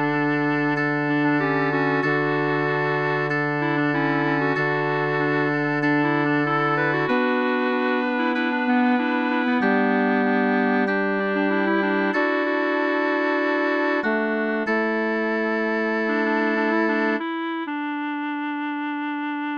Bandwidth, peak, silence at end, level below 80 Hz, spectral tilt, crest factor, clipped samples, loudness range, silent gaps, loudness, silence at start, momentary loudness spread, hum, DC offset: 6.6 kHz; -8 dBFS; 0 s; -70 dBFS; -7.5 dB/octave; 14 dB; under 0.1%; 2 LU; none; -22 LUFS; 0 s; 6 LU; none; under 0.1%